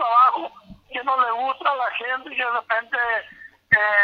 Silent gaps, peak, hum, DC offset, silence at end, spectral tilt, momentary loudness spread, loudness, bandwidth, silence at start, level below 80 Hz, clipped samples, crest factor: none; -4 dBFS; none; under 0.1%; 0 s; -5 dB/octave; 13 LU; -21 LUFS; 5.6 kHz; 0 s; -62 dBFS; under 0.1%; 18 dB